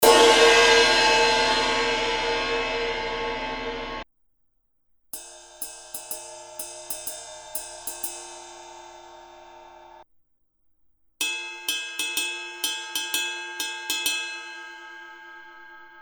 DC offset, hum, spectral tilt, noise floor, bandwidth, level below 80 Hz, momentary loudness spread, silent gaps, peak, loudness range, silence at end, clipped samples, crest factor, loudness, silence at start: under 0.1%; none; -0.5 dB/octave; -69 dBFS; over 20 kHz; -50 dBFS; 25 LU; none; -2 dBFS; 16 LU; 0 s; under 0.1%; 24 dB; -22 LUFS; 0 s